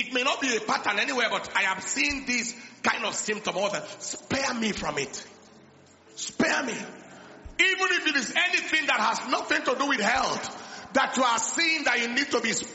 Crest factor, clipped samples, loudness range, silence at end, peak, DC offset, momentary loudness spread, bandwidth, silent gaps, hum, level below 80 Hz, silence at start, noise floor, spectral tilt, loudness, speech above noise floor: 20 dB; under 0.1%; 6 LU; 0 s; -8 dBFS; under 0.1%; 12 LU; 8.2 kHz; none; none; -58 dBFS; 0 s; -54 dBFS; -1.5 dB/octave; -25 LUFS; 28 dB